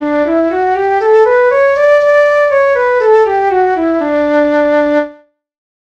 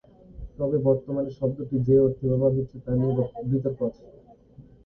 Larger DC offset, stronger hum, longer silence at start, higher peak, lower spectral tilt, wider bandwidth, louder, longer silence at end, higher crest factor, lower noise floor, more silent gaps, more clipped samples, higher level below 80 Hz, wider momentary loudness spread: first, 0.1% vs under 0.1%; neither; second, 0 s vs 0.35 s; first, 0 dBFS vs -8 dBFS; second, -5 dB/octave vs -13 dB/octave; first, 7.8 kHz vs 3.3 kHz; first, -10 LUFS vs -25 LUFS; first, 0.75 s vs 0.25 s; second, 10 dB vs 18 dB; second, -40 dBFS vs -51 dBFS; neither; neither; about the same, -48 dBFS vs -48 dBFS; second, 5 LU vs 11 LU